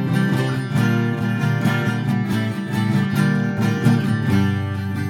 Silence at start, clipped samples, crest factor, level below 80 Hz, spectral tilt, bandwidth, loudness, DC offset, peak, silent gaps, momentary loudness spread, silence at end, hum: 0 s; under 0.1%; 16 dB; -54 dBFS; -7 dB/octave; 17 kHz; -20 LUFS; under 0.1%; -4 dBFS; none; 4 LU; 0 s; none